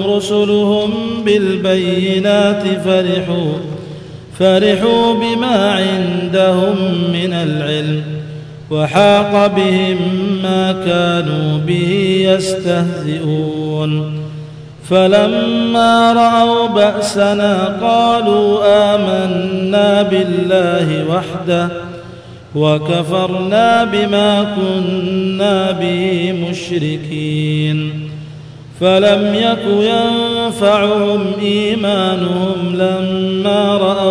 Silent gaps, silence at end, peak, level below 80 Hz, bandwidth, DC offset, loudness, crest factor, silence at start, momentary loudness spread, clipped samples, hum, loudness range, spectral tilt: none; 0 s; 0 dBFS; -50 dBFS; 11 kHz; under 0.1%; -13 LUFS; 14 dB; 0 s; 9 LU; under 0.1%; none; 4 LU; -6 dB/octave